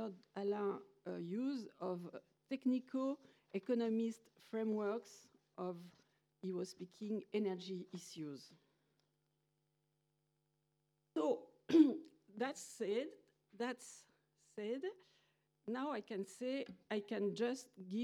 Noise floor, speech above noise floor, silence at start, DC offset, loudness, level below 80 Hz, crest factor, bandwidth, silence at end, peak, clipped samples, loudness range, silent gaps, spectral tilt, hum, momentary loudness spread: -84 dBFS; 41 dB; 0 s; under 0.1%; -42 LUFS; under -90 dBFS; 24 dB; 13 kHz; 0 s; -18 dBFS; under 0.1%; 9 LU; none; -6 dB/octave; none; 12 LU